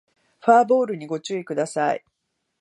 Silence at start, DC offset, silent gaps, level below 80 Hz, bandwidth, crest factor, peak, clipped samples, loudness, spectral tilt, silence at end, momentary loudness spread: 0.45 s; under 0.1%; none; -78 dBFS; 11.5 kHz; 20 dB; -2 dBFS; under 0.1%; -22 LUFS; -5 dB/octave; 0.65 s; 12 LU